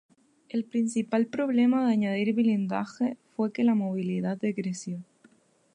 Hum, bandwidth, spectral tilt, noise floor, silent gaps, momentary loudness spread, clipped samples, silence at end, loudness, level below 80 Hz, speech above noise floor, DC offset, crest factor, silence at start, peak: none; 10 kHz; -6.5 dB/octave; -61 dBFS; none; 10 LU; under 0.1%; 0.7 s; -27 LUFS; -78 dBFS; 35 dB; under 0.1%; 14 dB; 0.55 s; -12 dBFS